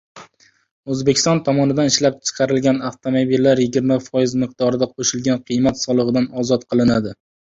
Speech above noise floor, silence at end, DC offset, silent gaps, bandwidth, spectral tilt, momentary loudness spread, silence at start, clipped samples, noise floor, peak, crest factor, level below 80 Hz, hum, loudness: 34 dB; 0.45 s; under 0.1%; 0.71-0.84 s; 7.8 kHz; -5 dB/octave; 6 LU; 0.15 s; under 0.1%; -51 dBFS; -2 dBFS; 16 dB; -50 dBFS; none; -18 LUFS